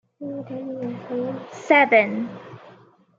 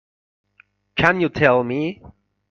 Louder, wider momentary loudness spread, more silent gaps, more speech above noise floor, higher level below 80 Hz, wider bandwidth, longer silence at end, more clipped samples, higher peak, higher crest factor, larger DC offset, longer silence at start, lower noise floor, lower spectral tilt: about the same, -21 LUFS vs -19 LUFS; first, 19 LU vs 12 LU; neither; second, 29 dB vs 39 dB; second, -76 dBFS vs -50 dBFS; about the same, 7.6 kHz vs 7.4 kHz; about the same, 0.45 s vs 0.45 s; neither; about the same, -2 dBFS vs 0 dBFS; about the same, 20 dB vs 22 dB; neither; second, 0.2 s vs 0.95 s; second, -52 dBFS vs -58 dBFS; second, -5.5 dB/octave vs -7 dB/octave